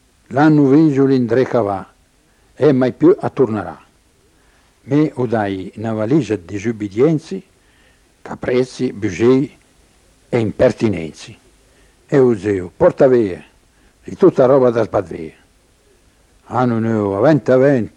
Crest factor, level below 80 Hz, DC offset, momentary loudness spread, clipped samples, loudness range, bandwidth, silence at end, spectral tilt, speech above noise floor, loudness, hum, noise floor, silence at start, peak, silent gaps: 16 dB; -50 dBFS; under 0.1%; 14 LU; under 0.1%; 5 LU; 10.5 kHz; 0.1 s; -8 dB/octave; 40 dB; -16 LUFS; none; -55 dBFS; 0.3 s; -2 dBFS; none